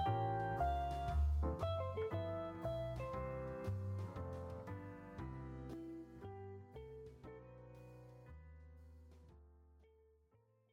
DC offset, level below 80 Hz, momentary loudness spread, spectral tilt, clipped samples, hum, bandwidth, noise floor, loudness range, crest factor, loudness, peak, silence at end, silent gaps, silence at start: under 0.1%; -50 dBFS; 20 LU; -8 dB/octave; under 0.1%; none; 9.4 kHz; -74 dBFS; 18 LU; 16 dB; -44 LUFS; -28 dBFS; 0.85 s; none; 0 s